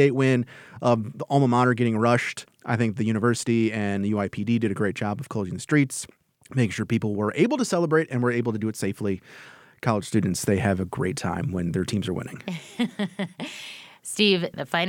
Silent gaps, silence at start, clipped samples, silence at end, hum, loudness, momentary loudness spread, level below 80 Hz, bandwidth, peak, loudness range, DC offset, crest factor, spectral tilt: none; 0 s; under 0.1%; 0 s; none; -25 LUFS; 12 LU; -60 dBFS; 16.5 kHz; -6 dBFS; 4 LU; under 0.1%; 20 dB; -5.5 dB/octave